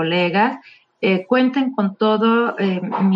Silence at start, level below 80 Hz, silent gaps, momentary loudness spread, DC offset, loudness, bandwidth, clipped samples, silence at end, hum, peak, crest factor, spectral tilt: 0 s; -70 dBFS; none; 5 LU; under 0.1%; -18 LUFS; 5.6 kHz; under 0.1%; 0 s; none; -4 dBFS; 14 dB; -8.5 dB/octave